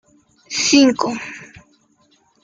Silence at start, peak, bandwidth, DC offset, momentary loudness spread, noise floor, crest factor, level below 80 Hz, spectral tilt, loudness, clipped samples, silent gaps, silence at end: 0.5 s; -2 dBFS; 9.4 kHz; under 0.1%; 20 LU; -59 dBFS; 18 dB; -60 dBFS; -2 dB/octave; -16 LUFS; under 0.1%; none; 1 s